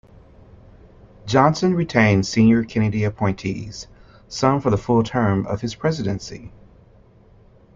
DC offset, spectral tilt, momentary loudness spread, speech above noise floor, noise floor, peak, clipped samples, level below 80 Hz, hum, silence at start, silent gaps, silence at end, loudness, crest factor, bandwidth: under 0.1%; -6.5 dB/octave; 18 LU; 31 dB; -50 dBFS; -2 dBFS; under 0.1%; -46 dBFS; none; 1.25 s; none; 1.3 s; -20 LUFS; 20 dB; 7.6 kHz